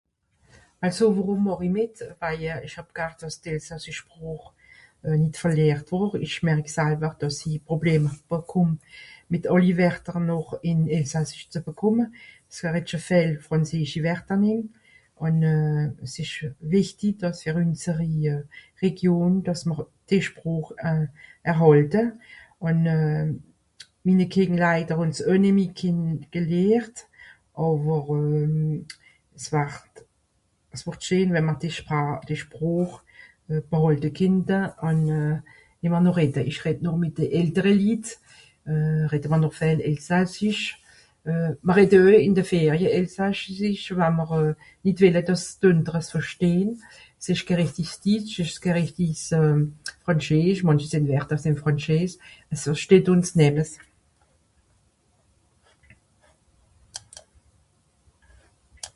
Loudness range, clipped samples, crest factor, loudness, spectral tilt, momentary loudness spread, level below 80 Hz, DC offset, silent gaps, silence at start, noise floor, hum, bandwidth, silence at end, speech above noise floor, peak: 6 LU; under 0.1%; 20 dB; -23 LUFS; -7 dB/octave; 12 LU; -54 dBFS; under 0.1%; none; 0.8 s; -69 dBFS; none; 11.5 kHz; 0.05 s; 46 dB; -4 dBFS